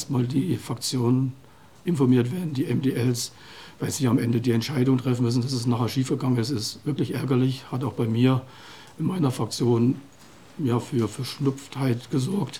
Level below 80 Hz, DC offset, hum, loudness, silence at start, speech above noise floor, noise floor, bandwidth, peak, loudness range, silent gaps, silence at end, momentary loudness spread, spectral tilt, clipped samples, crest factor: -66 dBFS; 0.2%; none; -25 LUFS; 0 s; 26 dB; -50 dBFS; 16 kHz; -8 dBFS; 2 LU; none; 0 s; 8 LU; -6.5 dB/octave; under 0.1%; 16 dB